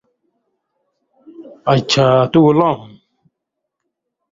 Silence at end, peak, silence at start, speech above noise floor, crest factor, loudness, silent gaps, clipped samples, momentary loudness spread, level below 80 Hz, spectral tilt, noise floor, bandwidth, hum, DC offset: 1.5 s; -2 dBFS; 1.4 s; 66 dB; 16 dB; -14 LUFS; none; under 0.1%; 10 LU; -52 dBFS; -6 dB/octave; -78 dBFS; 7.8 kHz; none; under 0.1%